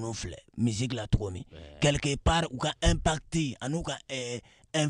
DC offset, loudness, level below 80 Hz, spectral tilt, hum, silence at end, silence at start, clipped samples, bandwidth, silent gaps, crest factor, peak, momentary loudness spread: under 0.1%; -30 LUFS; -38 dBFS; -4.5 dB/octave; none; 0 s; 0 s; under 0.1%; 11 kHz; none; 18 dB; -10 dBFS; 12 LU